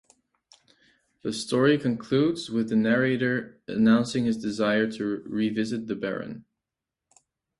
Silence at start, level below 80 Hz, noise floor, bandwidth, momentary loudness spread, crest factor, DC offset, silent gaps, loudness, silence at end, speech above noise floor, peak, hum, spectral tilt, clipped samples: 1.25 s; -64 dBFS; -87 dBFS; 11.5 kHz; 11 LU; 18 dB; under 0.1%; none; -25 LUFS; 1.2 s; 63 dB; -8 dBFS; none; -6 dB/octave; under 0.1%